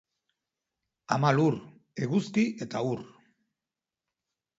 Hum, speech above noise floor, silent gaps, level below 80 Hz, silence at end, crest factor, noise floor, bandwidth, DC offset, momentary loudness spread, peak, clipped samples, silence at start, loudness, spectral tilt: none; over 63 dB; none; -72 dBFS; 1.5 s; 22 dB; under -90 dBFS; 8 kHz; under 0.1%; 13 LU; -8 dBFS; under 0.1%; 1.1 s; -29 LUFS; -7 dB/octave